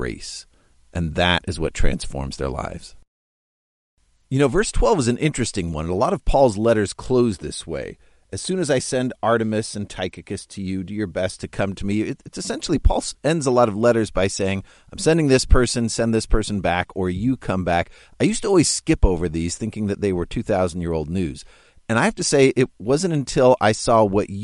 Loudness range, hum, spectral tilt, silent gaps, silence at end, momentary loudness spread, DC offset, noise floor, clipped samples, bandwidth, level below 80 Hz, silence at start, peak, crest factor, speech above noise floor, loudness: 6 LU; none; -5 dB/octave; 3.08-3.97 s; 0 s; 12 LU; under 0.1%; under -90 dBFS; under 0.1%; 11.5 kHz; -30 dBFS; 0 s; -2 dBFS; 18 dB; over 70 dB; -21 LUFS